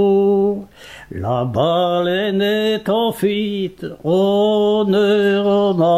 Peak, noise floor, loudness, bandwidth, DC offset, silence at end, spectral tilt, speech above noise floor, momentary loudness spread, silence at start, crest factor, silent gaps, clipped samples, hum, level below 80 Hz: -4 dBFS; -36 dBFS; -17 LUFS; 14.5 kHz; 0.1%; 0 s; -7 dB/octave; 19 dB; 11 LU; 0 s; 12 dB; none; under 0.1%; none; -52 dBFS